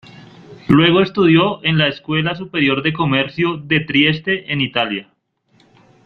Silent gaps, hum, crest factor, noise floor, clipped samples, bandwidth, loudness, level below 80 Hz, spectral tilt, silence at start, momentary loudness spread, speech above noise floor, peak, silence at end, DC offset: none; none; 16 dB; -58 dBFS; under 0.1%; 6.2 kHz; -16 LUFS; -50 dBFS; -8 dB/octave; 0.15 s; 7 LU; 42 dB; 0 dBFS; 1.05 s; under 0.1%